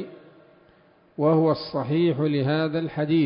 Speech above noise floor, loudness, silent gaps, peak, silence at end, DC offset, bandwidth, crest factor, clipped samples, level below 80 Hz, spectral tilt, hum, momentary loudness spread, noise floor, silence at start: 35 dB; -23 LUFS; none; -8 dBFS; 0 s; under 0.1%; 5.4 kHz; 16 dB; under 0.1%; -64 dBFS; -12 dB/octave; none; 6 LU; -57 dBFS; 0 s